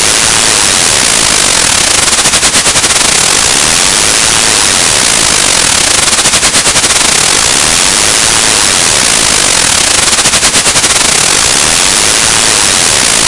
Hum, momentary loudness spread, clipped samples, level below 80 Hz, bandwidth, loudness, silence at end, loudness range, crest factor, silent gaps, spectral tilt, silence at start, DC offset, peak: none; 0 LU; 4%; -30 dBFS; 12 kHz; -4 LUFS; 0 s; 0 LU; 8 dB; none; 0 dB/octave; 0 s; under 0.1%; 0 dBFS